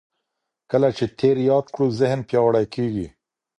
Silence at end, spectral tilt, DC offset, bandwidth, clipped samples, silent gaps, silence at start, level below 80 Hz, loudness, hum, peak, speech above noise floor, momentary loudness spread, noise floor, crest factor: 0.5 s; -7.5 dB/octave; under 0.1%; 10.5 kHz; under 0.1%; none; 0.7 s; -54 dBFS; -21 LUFS; none; -6 dBFS; 60 dB; 7 LU; -80 dBFS; 16 dB